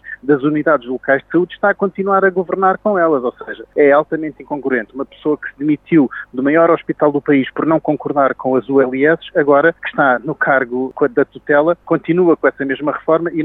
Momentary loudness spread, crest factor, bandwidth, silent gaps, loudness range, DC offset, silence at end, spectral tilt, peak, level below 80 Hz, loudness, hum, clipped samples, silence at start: 7 LU; 14 dB; 3.9 kHz; none; 2 LU; under 0.1%; 0 s; -10 dB/octave; 0 dBFS; -56 dBFS; -15 LUFS; none; under 0.1%; 0.05 s